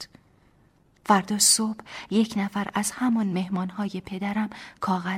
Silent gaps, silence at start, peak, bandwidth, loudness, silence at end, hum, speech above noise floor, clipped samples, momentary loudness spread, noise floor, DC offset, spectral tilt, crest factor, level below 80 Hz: none; 0 s; -6 dBFS; 16 kHz; -25 LUFS; 0 s; none; 35 dB; under 0.1%; 14 LU; -61 dBFS; under 0.1%; -3 dB/octave; 20 dB; -62 dBFS